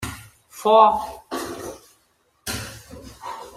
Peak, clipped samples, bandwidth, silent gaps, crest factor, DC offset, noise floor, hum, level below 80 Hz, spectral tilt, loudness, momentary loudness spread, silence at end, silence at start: -2 dBFS; under 0.1%; 16 kHz; none; 22 dB; under 0.1%; -64 dBFS; none; -50 dBFS; -4 dB/octave; -20 LUFS; 26 LU; 0.05 s; 0 s